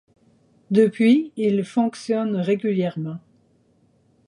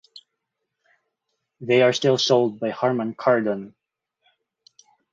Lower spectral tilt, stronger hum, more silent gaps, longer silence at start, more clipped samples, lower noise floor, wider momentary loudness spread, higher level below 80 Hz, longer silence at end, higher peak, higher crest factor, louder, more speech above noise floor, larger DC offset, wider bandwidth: first, -7.5 dB/octave vs -5 dB/octave; neither; neither; first, 0.7 s vs 0.15 s; neither; second, -61 dBFS vs -80 dBFS; about the same, 11 LU vs 12 LU; about the same, -72 dBFS vs -70 dBFS; second, 1.1 s vs 1.45 s; about the same, -4 dBFS vs -4 dBFS; about the same, 18 dB vs 20 dB; about the same, -21 LUFS vs -21 LUFS; second, 41 dB vs 60 dB; neither; first, 11 kHz vs 7.6 kHz